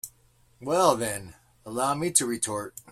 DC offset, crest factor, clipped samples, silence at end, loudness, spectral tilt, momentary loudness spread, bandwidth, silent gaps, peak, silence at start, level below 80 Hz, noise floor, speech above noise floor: under 0.1%; 24 dB; under 0.1%; 0 s; -26 LUFS; -3 dB/octave; 14 LU; 16 kHz; none; -4 dBFS; 0.05 s; -62 dBFS; -62 dBFS; 35 dB